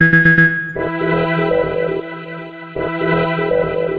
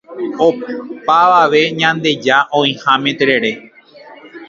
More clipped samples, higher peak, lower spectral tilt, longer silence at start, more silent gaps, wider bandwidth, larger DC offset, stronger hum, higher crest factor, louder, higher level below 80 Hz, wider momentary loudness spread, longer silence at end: neither; about the same, 0 dBFS vs 0 dBFS; first, -9 dB/octave vs -4.5 dB/octave; about the same, 0 s vs 0.1 s; neither; second, 5.2 kHz vs 7.6 kHz; neither; neither; about the same, 16 dB vs 14 dB; about the same, -15 LUFS vs -13 LUFS; first, -42 dBFS vs -60 dBFS; first, 18 LU vs 13 LU; about the same, 0 s vs 0.05 s